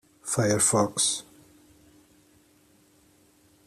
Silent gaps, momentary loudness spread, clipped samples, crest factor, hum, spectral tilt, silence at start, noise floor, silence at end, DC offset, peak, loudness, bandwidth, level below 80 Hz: none; 9 LU; under 0.1%; 22 dB; none; -3 dB/octave; 0.25 s; -61 dBFS; 2.45 s; under 0.1%; -10 dBFS; -24 LUFS; 14.5 kHz; -64 dBFS